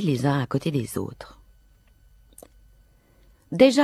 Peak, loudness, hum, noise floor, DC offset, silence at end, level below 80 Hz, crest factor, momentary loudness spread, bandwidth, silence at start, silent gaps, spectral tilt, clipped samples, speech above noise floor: -4 dBFS; -24 LUFS; none; -57 dBFS; under 0.1%; 0 s; -56 dBFS; 22 dB; 22 LU; 14 kHz; 0 s; none; -6 dB/octave; under 0.1%; 35 dB